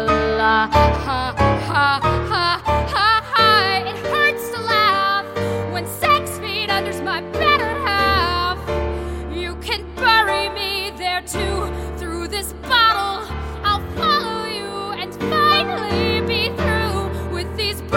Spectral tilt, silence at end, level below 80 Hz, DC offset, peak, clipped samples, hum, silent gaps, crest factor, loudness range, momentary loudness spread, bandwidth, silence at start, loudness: -4.5 dB/octave; 0 s; -32 dBFS; under 0.1%; -2 dBFS; under 0.1%; none; none; 18 dB; 4 LU; 11 LU; 17 kHz; 0 s; -19 LUFS